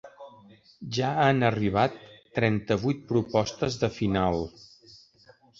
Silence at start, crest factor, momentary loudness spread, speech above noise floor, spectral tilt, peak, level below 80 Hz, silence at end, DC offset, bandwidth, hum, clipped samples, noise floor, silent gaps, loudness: 0.05 s; 20 dB; 11 LU; 32 dB; -6.5 dB/octave; -8 dBFS; -52 dBFS; 1.1 s; under 0.1%; 7.8 kHz; none; under 0.1%; -58 dBFS; none; -26 LUFS